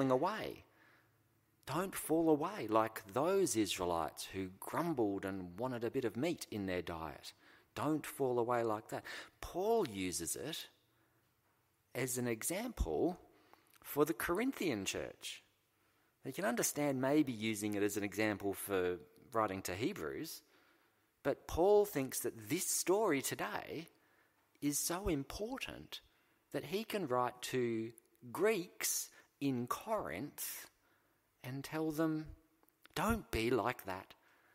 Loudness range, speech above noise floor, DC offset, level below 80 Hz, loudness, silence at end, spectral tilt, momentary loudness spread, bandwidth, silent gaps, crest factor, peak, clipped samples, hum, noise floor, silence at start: 5 LU; 39 dB; under 0.1%; -60 dBFS; -38 LUFS; 0.5 s; -4 dB/octave; 14 LU; 16 kHz; none; 22 dB; -16 dBFS; under 0.1%; none; -77 dBFS; 0 s